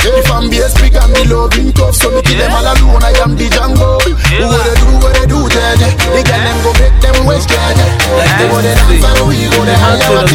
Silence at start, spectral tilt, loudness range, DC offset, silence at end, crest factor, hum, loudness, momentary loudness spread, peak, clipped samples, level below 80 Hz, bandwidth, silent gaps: 0 s; -4.5 dB/octave; 1 LU; under 0.1%; 0 s; 8 dB; none; -9 LUFS; 2 LU; 0 dBFS; 1%; -10 dBFS; 16.5 kHz; none